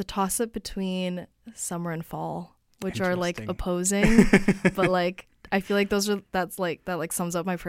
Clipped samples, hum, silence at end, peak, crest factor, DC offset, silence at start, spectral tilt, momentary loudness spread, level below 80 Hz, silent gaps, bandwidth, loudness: under 0.1%; none; 0 s; -2 dBFS; 22 dB; under 0.1%; 0 s; -5 dB/octave; 14 LU; -40 dBFS; none; 16.5 kHz; -26 LUFS